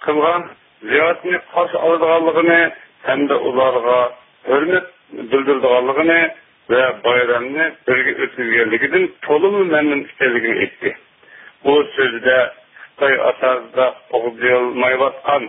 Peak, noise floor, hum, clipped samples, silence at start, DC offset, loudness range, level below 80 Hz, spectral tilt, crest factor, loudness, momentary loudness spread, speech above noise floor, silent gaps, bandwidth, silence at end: 0 dBFS; -44 dBFS; none; under 0.1%; 0 s; under 0.1%; 2 LU; -60 dBFS; -9.5 dB/octave; 16 dB; -16 LUFS; 7 LU; 28 dB; none; 3.9 kHz; 0 s